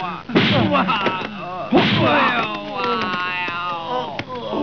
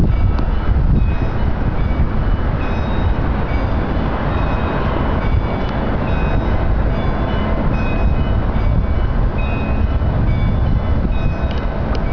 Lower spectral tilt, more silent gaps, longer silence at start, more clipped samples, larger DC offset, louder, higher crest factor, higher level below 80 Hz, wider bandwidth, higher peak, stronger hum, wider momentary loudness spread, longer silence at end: second, -6.5 dB/octave vs -9.5 dB/octave; neither; about the same, 0 s vs 0 s; neither; second, 0.4% vs 4%; about the same, -19 LUFS vs -19 LUFS; first, 18 dB vs 10 dB; second, -54 dBFS vs -18 dBFS; about the same, 5.4 kHz vs 5.4 kHz; first, -2 dBFS vs -6 dBFS; neither; first, 11 LU vs 3 LU; about the same, 0 s vs 0 s